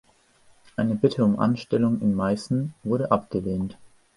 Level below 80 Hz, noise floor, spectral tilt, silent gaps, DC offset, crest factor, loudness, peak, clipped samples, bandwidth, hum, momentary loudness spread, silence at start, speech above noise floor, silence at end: -54 dBFS; -58 dBFS; -8 dB/octave; none; under 0.1%; 18 dB; -24 LUFS; -6 dBFS; under 0.1%; 11.5 kHz; none; 8 LU; 0.8 s; 35 dB; 0.3 s